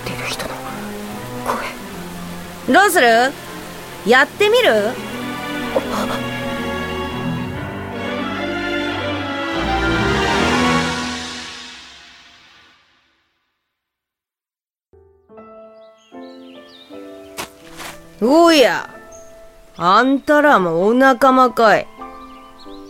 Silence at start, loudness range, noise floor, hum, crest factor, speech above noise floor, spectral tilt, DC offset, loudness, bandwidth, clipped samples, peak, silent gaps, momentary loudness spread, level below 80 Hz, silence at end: 0 s; 12 LU; under -90 dBFS; none; 18 dB; over 77 dB; -4.5 dB/octave; under 0.1%; -16 LUFS; 16.5 kHz; under 0.1%; -2 dBFS; none; 21 LU; -40 dBFS; 0 s